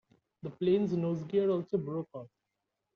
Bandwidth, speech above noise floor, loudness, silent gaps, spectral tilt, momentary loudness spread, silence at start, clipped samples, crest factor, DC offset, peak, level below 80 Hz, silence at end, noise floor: 6.6 kHz; 54 dB; -32 LUFS; none; -8.5 dB/octave; 17 LU; 0.45 s; under 0.1%; 16 dB; under 0.1%; -18 dBFS; -72 dBFS; 0.7 s; -85 dBFS